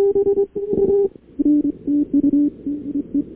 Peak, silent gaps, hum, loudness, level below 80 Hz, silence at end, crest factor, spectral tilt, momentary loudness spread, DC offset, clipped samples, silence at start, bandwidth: -8 dBFS; none; none; -19 LUFS; -48 dBFS; 0 s; 10 dB; -14 dB/octave; 7 LU; under 0.1%; under 0.1%; 0 s; 1.7 kHz